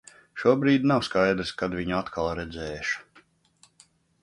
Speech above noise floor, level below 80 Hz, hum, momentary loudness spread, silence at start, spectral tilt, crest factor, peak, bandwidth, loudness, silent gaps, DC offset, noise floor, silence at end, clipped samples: 37 dB; -52 dBFS; none; 12 LU; 0.35 s; -6 dB/octave; 20 dB; -6 dBFS; 11 kHz; -26 LUFS; none; under 0.1%; -62 dBFS; 1.2 s; under 0.1%